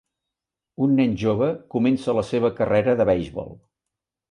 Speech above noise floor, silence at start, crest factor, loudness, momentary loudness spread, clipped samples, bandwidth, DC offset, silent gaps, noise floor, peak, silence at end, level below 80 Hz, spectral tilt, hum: 65 dB; 0.8 s; 16 dB; -21 LUFS; 6 LU; under 0.1%; 10.5 kHz; under 0.1%; none; -86 dBFS; -8 dBFS; 0.75 s; -50 dBFS; -8 dB/octave; none